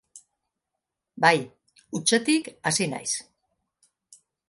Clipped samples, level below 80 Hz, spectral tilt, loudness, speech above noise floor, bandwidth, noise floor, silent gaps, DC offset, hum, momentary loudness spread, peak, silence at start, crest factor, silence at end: under 0.1%; -72 dBFS; -3 dB/octave; -24 LUFS; 61 dB; 11.5 kHz; -85 dBFS; none; under 0.1%; none; 10 LU; -4 dBFS; 0.15 s; 24 dB; 1.25 s